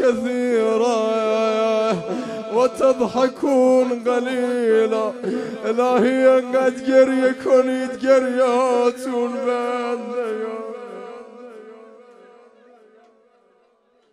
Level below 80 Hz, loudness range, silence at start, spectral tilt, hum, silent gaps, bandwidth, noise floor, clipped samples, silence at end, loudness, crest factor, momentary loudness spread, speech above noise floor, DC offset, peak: -66 dBFS; 11 LU; 0 s; -5 dB/octave; none; none; 11.5 kHz; -60 dBFS; under 0.1%; 2.35 s; -19 LUFS; 18 dB; 11 LU; 42 dB; under 0.1%; -2 dBFS